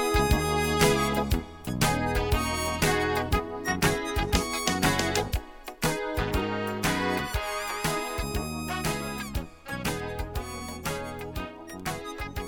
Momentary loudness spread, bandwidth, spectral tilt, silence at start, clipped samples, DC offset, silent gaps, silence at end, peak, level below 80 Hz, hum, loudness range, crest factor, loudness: 11 LU; 18 kHz; -4 dB/octave; 0 s; under 0.1%; under 0.1%; none; 0 s; -10 dBFS; -36 dBFS; none; 7 LU; 18 dB; -28 LUFS